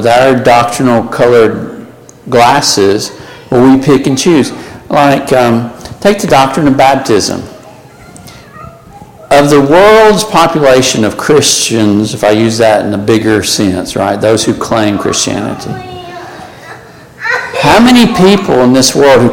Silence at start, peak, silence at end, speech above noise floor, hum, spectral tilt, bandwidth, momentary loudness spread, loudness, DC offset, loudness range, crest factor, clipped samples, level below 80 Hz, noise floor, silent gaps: 0 s; 0 dBFS; 0 s; 26 dB; none; -4.5 dB/octave; 17.5 kHz; 15 LU; -8 LUFS; under 0.1%; 5 LU; 8 dB; 0.2%; -38 dBFS; -33 dBFS; none